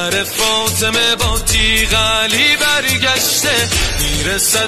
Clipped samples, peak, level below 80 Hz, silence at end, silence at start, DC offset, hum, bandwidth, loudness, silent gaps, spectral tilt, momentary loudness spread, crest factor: under 0.1%; 0 dBFS; -26 dBFS; 0 s; 0 s; 1%; none; 13.5 kHz; -12 LUFS; none; -1.5 dB/octave; 4 LU; 14 dB